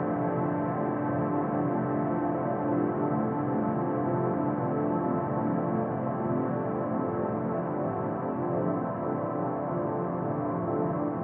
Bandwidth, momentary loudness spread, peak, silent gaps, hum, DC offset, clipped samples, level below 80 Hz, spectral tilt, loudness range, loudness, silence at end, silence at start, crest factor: 3.3 kHz; 3 LU; -16 dBFS; none; none; under 0.1%; under 0.1%; -62 dBFS; -10 dB/octave; 2 LU; -29 LUFS; 0 s; 0 s; 12 dB